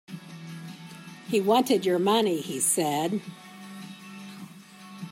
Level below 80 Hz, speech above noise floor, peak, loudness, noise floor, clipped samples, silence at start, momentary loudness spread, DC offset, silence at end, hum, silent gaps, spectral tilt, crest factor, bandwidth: -78 dBFS; 22 dB; -10 dBFS; -25 LUFS; -47 dBFS; under 0.1%; 0.1 s; 21 LU; under 0.1%; 0 s; none; none; -4 dB/octave; 18 dB; 16 kHz